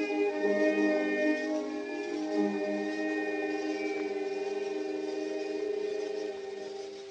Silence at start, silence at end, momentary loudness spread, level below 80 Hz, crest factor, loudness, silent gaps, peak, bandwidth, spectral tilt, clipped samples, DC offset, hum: 0 s; 0 s; 8 LU; -78 dBFS; 16 dB; -32 LUFS; none; -16 dBFS; 8.8 kHz; -5 dB/octave; under 0.1%; under 0.1%; none